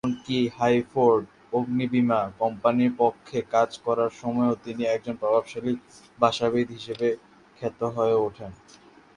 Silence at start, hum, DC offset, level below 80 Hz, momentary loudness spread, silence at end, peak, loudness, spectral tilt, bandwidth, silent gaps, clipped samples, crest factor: 0.05 s; none; under 0.1%; -62 dBFS; 9 LU; 0.6 s; -4 dBFS; -25 LUFS; -6.5 dB/octave; 10 kHz; none; under 0.1%; 22 dB